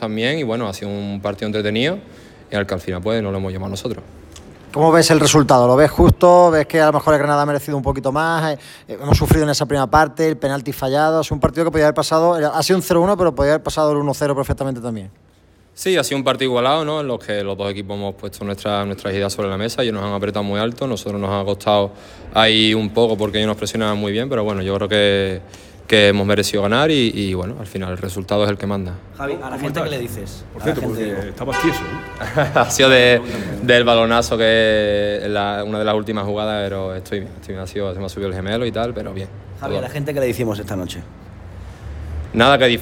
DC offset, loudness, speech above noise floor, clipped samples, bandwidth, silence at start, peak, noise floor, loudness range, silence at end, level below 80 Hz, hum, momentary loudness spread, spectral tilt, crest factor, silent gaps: under 0.1%; -17 LUFS; 22 dB; under 0.1%; 17.5 kHz; 0 s; 0 dBFS; -40 dBFS; 10 LU; 0 s; -38 dBFS; none; 15 LU; -5 dB/octave; 18 dB; none